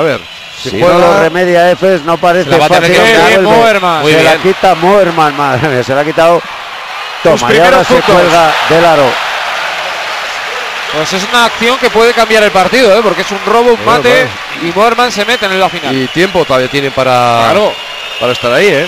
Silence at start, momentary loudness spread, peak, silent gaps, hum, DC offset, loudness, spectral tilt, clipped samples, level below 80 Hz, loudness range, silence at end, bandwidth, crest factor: 0 s; 10 LU; 0 dBFS; none; none; under 0.1%; -8 LUFS; -4 dB/octave; 0.2%; -40 dBFS; 4 LU; 0 s; 16 kHz; 8 dB